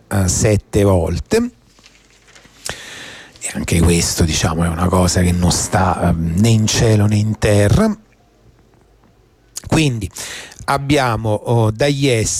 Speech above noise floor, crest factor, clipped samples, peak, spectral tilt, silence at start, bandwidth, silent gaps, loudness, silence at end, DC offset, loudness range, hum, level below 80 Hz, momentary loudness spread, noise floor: 37 dB; 12 dB; under 0.1%; -4 dBFS; -5 dB/octave; 0.1 s; 16 kHz; none; -16 LUFS; 0 s; under 0.1%; 6 LU; none; -32 dBFS; 14 LU; -51 dBFS